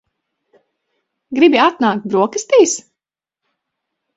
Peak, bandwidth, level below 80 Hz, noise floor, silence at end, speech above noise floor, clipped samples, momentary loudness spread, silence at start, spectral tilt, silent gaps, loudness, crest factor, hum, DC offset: 0 dBFS; 8 kHz; -64 dBFS; -85 dBFS; 1.35 s; 72 dB; under 0.1%; 9 LU; 1.3 s; -3.5 dB/octave; none; -14 LUFS; 18 dB; none; under 0.1%